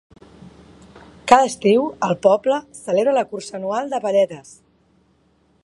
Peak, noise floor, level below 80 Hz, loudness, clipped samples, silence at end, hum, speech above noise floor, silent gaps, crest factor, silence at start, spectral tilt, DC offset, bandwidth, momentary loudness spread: 0 dBFS; -60 dBFS; -58 dBFS; -19 LUFS; under 0.1%; 1.25 s; none; 42 dB; none; 20 dB; 1.25 s; -5 dB/octave; under 0.1%; 11.5 kHz; 12 LU